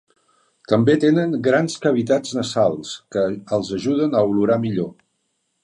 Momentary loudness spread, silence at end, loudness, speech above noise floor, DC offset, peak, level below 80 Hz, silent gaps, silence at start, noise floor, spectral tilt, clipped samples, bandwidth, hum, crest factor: 8 LU; 0.7 s; -20 LUFS; 52 dB; under 0.1%; -2 dBFS; -58 dBFS; none; 0.7 s; -71 dBFS; -6 dB/octave; under 0.1%; 11 kHz; none; 18 dB